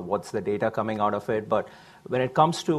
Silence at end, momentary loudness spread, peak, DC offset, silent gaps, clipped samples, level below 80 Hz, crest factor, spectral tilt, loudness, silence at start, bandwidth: 0 s; 7 LU; -6 dBFS; under 0.1%; none; under 0.1%; -60 dBFS; 20 dB; -6 dB/octave; -26 LUFS; 0 s; 14 kHz